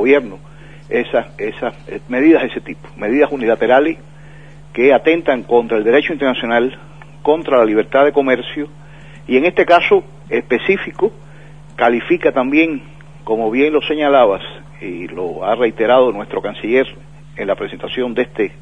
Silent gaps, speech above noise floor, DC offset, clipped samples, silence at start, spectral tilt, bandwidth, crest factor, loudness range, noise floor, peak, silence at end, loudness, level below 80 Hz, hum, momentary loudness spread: none; 24 dB; 0.9%; under 0.1%; 0 s; -7 dB/octave; 8.6 kHz; 16 dB; 3 LU; -38 dBFS; 0 dBFS; 0.1 s; -15 LUFS; -48 dBFS; none; 14 LU